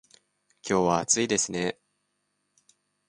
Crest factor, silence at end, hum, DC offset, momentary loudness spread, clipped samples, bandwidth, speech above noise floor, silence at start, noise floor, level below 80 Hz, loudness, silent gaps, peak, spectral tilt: 24 dB; 1.35 s; 50 Hz at -60 dBFS; under 0.1%; 15 LU; under 0.1%; 11.5 kHz; 51 dB; 0.65 s; -77 dBFS; -62 dBFS; -25 LUFS; none; -6 dBFS; -3 dB/octave